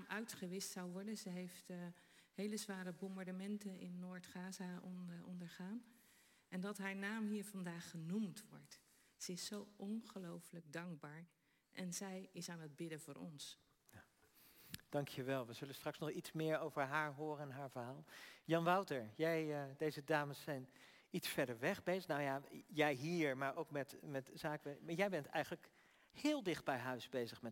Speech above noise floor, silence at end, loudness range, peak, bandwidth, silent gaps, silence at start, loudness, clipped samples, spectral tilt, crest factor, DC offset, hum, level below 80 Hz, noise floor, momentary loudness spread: 27 dB; 0 s; 9 LU; -24 dBFS; 16.5 kHz; none; 0 s; -45 LUFS; under 0.1%; -5 dB/octave; 22 dB; under 0.1%; none; -86 dBFS; -72 dBFS; 14 LU